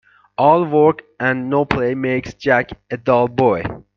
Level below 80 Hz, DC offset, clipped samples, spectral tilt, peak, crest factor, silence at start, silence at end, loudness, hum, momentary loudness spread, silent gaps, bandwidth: -46 dBFS; under 0.1%; under 0.1%; -7.5 dB/octave; 0 dBFS; 16 dB; 0.4 s; 0.15 s; -17 LUFS; none; 8 LU; none; 6.8 kHz